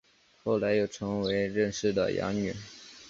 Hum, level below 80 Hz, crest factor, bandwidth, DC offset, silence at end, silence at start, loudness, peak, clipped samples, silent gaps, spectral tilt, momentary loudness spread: none; -58 dBFS; 16 dB; 7.8 kHz; under 0.1%; 0 s; 0.45 s; -30 LUFS; -14 dBFS; under 0.1%; none; -5.5 dB/octave; 10 LU